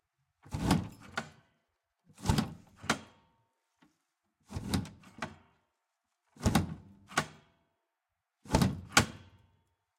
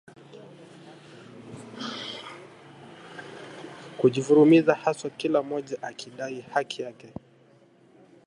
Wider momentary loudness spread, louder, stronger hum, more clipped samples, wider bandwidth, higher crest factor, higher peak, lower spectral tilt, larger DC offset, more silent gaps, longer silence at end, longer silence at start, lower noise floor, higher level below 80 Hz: second, 17 LU vs 28 LU; second, -34 LUFS vs -25 LUFS; neither; neither; first, 16.5 kHz vs 11 kHz; first, 28 dB vs 22 dB; about the same, -8 dBFS vs -6 dBFS; second, -4.5 dB/octave vs -6 dB/octave; neither; neither; second, 0.8 s vs 1.2 s; about the same, 0.45 s vs 0.35 s; first, -86 dBFS vs -58 dBFS; first, -50 dBFS vs -72 dBFS